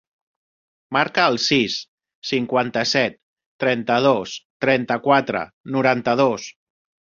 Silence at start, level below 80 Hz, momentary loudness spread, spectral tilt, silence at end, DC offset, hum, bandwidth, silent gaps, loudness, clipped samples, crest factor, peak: 0.9 s; -62 dBFS; 9 LU; -4.5 dB/octave; 0.6 s; under 0.1%; none; 7.6 kHz; 1.88-1.98 s, 2.15-2.22 s, 3.23-3.37 s, 3.46-3.59 s, 4.45-4.60 s, 5.53-5.64 s; -20 LUFS; under 0.1%; 20 dB; -2 dBFS